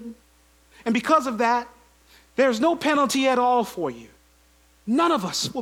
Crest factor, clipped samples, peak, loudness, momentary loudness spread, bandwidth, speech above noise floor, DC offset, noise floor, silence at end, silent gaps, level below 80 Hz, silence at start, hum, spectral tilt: 18 dB; under 0.1%; -6 dBFS; -22 LUFS; 13 LU; 17.5 kHz; 36 dB; under 0.1%; -58 dBFS; 0 s; none; -60 dBFS; 0 s; none; -3.5 dB/octave